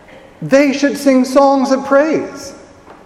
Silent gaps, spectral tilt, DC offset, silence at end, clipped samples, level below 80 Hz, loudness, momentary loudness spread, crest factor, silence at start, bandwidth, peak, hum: none; -5 dB/octave; under 0.1%; 0.45 s; under 0.1%; -52 dBFS; -12 LUFS; 18 LU; 14 dB; 0.4 s; 14 kHz; 0 dBFS; none